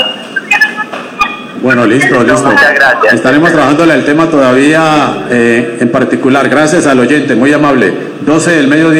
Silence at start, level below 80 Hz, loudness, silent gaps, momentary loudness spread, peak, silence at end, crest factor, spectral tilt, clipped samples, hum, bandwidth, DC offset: 0 s; -44 dBFS; -7 LUFS; none; 7 LU; 0 dBFS; 0 s; 8 dB; -5 dB/octave; 0.9%; none; 15 kHz; under 0.1%